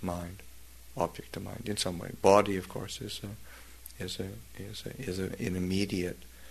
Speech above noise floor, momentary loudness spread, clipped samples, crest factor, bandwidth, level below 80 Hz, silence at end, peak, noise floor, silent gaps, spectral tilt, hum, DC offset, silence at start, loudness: 20 dB; 23 LU; under 0.1%; 26 dB; 13.5 kHz; -54 dBFS; 0 s; -8 dBFS; -52 dBFS; none; -5 dB/octave; none; 0.2%; 0 s; -33 LUFS